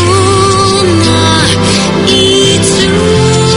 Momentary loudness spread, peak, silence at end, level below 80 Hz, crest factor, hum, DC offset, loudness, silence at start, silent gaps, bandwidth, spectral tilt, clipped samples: 2 LU; 0 dBFS; 0 s; -30 dBFS; 8 dB; none; under 0.1%; -7 LUFS; 0 s; none; 11.5 kHz; -4 dB/octave; 0.7%